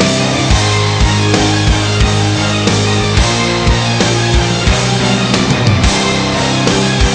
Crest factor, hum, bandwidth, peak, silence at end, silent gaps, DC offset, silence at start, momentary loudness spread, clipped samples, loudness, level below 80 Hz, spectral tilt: 12 dB; none; 10.5 kHz; 0 dBFS; 0 s; none; under 0.1%; 0 s; 1 LU; under 0.1%; -11 LUFS; -20 dBFS; -4.5 dB/octave